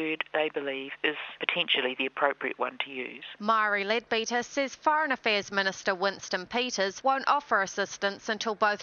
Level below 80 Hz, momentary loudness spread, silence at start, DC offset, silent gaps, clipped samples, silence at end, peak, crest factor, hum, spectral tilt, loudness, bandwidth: -74 dBFS; 7 LU; 0 s; under 0.1%; none; under 0.1%; 0 s; -6 dBFS; 24 dB; none; -2.5 dB/octave; -28 LUFS; 7.2 kHz